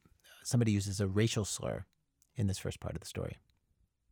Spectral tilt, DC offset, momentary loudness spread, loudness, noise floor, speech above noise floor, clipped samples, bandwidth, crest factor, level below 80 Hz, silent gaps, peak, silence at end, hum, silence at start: -5.5 dB/octave; under 0.1%; 13 LU; -35 LUFS; -76 dBFS; 42 dB; under 0.1%; 19.5 kHz; 18 dB; -58 dBFS; none; -18 dBFS; 0.75 s; none; 0.3 s